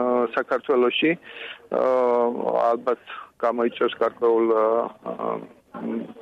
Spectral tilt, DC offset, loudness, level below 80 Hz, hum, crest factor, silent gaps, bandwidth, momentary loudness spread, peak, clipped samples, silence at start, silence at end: -6.5 dB/octave; under 0.1%; -23 LUFS; -72 dBFS; none; 14 dB; none; 6.4 kHz; 12 LU; -10 dBFS; under 0.1%; 0 s; 0 s